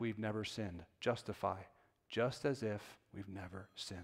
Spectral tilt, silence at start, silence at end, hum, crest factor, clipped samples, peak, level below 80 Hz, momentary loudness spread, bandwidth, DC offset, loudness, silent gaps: -5.5 dB/octave; 0 s; 0 s; none; 20 dB; under 0.1%; -22 dBFS; -70 dBFS; 12 LU; 16 kHz; under 0.1%; -42 LUFS; none